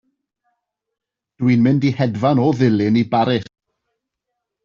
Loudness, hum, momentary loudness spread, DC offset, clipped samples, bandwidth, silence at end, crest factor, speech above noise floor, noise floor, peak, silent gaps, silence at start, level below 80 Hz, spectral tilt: -17 LUFS; none; 5 LU; under 0.1%; under 0.1%; 7.2 kHz; 1.2 s; 16 dB; 64 dB; -79 dBFS; -4 dBFS; none; 1.4 s; -56 dBFS; -7 dB/octave